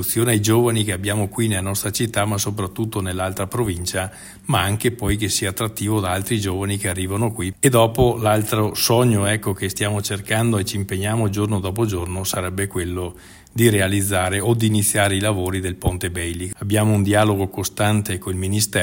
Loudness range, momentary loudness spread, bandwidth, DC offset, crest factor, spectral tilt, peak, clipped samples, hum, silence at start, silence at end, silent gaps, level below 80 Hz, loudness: 4 LU; 8 LU; 16.5 kHz; under 0.1%; 18 dB; -4.5 dB/octave; -2 dBFS; under 0.1%; none; 0 s; 0 s; none; -44 dBFS; -20 LUFS